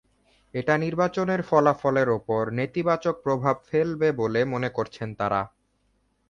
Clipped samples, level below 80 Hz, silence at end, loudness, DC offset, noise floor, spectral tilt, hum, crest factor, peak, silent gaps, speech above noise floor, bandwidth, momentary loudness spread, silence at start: under 0.1%; -58 dBFS; 0.8 s; -25 LUFS; under 0.1%; -69 dBFS; -7.5 dB/octave; none; 20 dB; -6 dBFS; none; 45 dB; 7.2 kHz; 8 LU; 0.55 s